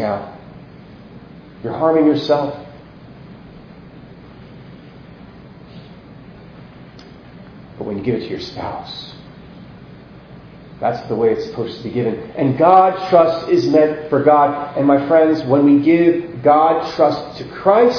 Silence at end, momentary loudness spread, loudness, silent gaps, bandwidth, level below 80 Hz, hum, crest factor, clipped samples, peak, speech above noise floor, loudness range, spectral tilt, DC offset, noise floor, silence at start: 0 s; 16 LU; -16 LUFS; none; 5.4 kHz; -52 dBFS; none; 18 dB; under 0.1%; 0 dBFS; 24 dB; 14 LU; -8 dB/octave; under 0.1%; -39 dBFS; 0 s